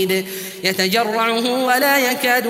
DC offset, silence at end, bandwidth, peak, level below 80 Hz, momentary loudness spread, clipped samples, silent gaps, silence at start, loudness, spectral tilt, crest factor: under 0.1%; 0 s; 16.5 kHz; 0 dBFS; -68 dBFS; 7 LU; under 0.1%; none; 0 s; -17 LUFS; -3 dB/octave; 18 dB